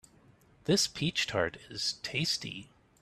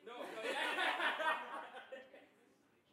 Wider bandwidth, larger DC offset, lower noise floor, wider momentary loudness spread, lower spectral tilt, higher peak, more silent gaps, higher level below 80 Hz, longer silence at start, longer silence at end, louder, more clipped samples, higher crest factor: second, 14.5 kHz vs 16.5 kHz; neither; second, -62 dBFS vs -72 dBFS; second, 12 LU vs 17 LU; first, -3 dB/octave vs -1 dB/octave; first, -14 dBFS vs -24 dBFS; neither; first, -64 dBFS vs under -90 dBFS; first, 0.65 s vs 0 s; second, 0.35 s vs 0.7 s; first, -31 LUFS vs -39 LUFS; neither; about the same, 20 dB vs 20 dB